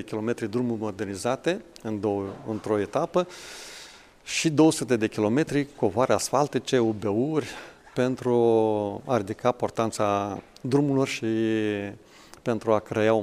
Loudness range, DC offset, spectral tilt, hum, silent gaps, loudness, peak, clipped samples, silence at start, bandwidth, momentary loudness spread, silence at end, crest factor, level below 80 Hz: 5 LU; under 0.1%; -5.5 dB/octave; none; none; -26 LUFS; -6 dBFS; under 0.1%; 0 s; 15 kHz; 13 LU; 0 s; 18 dB; -60 dBFS